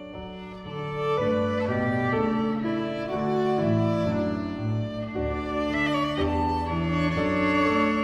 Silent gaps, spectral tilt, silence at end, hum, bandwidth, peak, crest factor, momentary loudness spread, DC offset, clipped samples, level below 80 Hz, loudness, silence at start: none; -7.5 dB/octave; 0 s; none; 10.5 kHz; -12 dBFS; 14 dB; 8 LU; under 0.1%; under 0.1%; -44 dBFS; -26 LUFS; 0 s